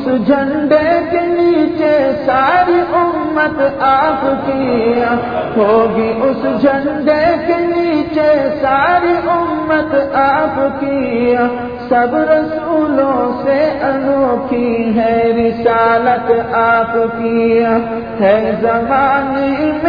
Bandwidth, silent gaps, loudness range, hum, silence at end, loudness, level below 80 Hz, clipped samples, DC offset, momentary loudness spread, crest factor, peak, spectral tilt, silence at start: 5.2 kHz; none; 1 LU; none; 0 s; -13 LUFS; -42 dBFS; under 0.1%; 0.3%; 4 LU; 12 dB; 0 dBFS; -8.5 dB/octave; 0 s